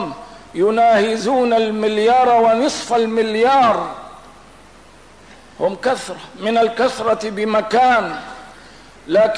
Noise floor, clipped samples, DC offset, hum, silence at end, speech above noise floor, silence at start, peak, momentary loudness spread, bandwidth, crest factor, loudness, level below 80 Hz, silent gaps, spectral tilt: -44 dBFS; under 0.1%; 0.3%; none; 0 s; 29 dB; 0 s; -6 dBFS; 16 LU; 11 kHz; 12 dB; -16 LUFS; -54 dBFS; none; -4.5 dB/octave